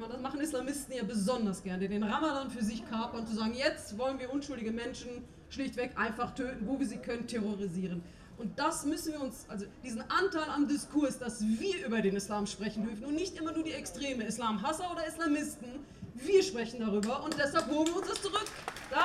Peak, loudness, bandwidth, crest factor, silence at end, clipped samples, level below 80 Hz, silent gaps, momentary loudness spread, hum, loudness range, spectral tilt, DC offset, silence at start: -14 dBFS; -35 LUFS; 14.5 kHz; 20 dB; 0 s; under 0.1%; -58 dBFS; none; 10 LU; none; 4 LU; -4.5 dB/octave; under 0.1%; 0 s